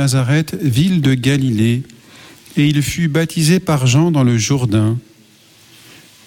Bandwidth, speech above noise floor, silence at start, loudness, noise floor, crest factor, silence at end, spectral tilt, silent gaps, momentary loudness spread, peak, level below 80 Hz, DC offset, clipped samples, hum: 17.5 kHz; 33 dB; 0 s; -15 LUFS; -47 dBFS; 12 dB; 1.25 s; -5.5 dB/octave; none; 5 LU; -2 dBFS; -46 dBFS; under 0.1%; under 0.1%; none